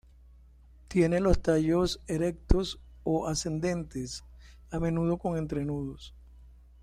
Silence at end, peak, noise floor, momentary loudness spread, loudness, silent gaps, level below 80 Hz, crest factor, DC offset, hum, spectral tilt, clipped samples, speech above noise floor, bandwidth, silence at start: 0.35 s; -6 dBFS; -55 dBFS; 13 LU; -30 LUFS; none; -38 dBFS; 24 dB; under 0.1%; none; -6 dB/octave; under 0.1%; 27 dB; 14.5 kHz; 0.9 s